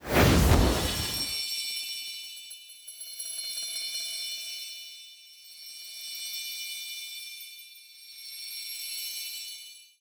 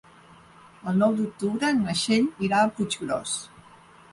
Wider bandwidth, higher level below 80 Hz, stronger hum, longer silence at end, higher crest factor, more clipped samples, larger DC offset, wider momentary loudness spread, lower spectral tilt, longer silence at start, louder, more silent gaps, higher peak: first, over 20 kHz vs 11.5 kHz; first, -38 dBFS vs -62 dBFS; neither; second, 0.15 s vs 0.65 s; first, 22 dB vs 16 dB; neither; neither; first, 20 LU vs 8 LU; about the same, -3.5 dB/octave vs -4.5 dB/octave; second, 0 s vs 0.85 s; second, -30 LUFS vs -25 LUFS; neither; about the same, -8 dBFS vs -10 dBFS